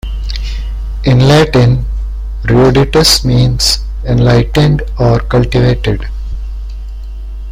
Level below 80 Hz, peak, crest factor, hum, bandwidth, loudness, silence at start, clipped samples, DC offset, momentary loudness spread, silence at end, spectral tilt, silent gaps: -18 dBFS; 0 dBFS; 10 dB; none; 16 kHz; -10 LUFS; 0.05 s; under 0.1%; under 0.1%; 17 LU; 0 s; -5.5 dB/octave; none